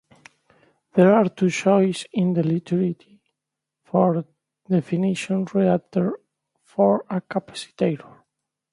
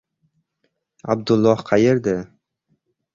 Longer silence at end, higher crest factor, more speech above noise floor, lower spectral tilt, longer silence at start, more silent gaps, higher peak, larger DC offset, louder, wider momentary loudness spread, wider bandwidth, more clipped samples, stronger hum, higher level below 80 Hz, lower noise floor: second, 0.75 s vs 0.9 s; about the same, 18 dB vs 20 dB; first, 64 dB vs 54 dB; about the same, -7 dB/octave vs -7 dB/octave; about the same, 0.95 s vs 1.05 s; neither; about the same, -4 dBFS vs -2 dBFS; neither; second, -22 LUFS vs -19 LUFS; second, 11 LU vs 15 LU; first, 11 kHz vs 7.4 kHz; neither; neither; second, -66 dBFS vs -54 dBFS; first, -84 dBFS vs -72 dBFS